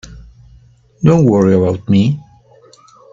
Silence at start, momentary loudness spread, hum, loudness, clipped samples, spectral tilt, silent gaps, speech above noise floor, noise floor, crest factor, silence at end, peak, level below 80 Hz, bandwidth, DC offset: 0.05 s; 7 LU; none; -13 LUFS; under 0.1%; -8.5 dB/octave; none; 35 dB; -46 dBFS; 14 dB; 0.95 s; 0 dBFS; -44 dBFS; 7.6 kHz; under 0.1%